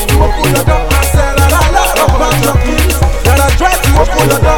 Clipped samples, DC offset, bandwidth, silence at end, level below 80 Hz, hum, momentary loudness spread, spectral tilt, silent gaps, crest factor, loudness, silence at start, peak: 0.3%; 6%; 19.5 kHz; 0 s; -12 dBFS; none; 2 LU; -4.5 dB/octave; none; 8 dB; -10 LUFS; 0 s; 0 dBFS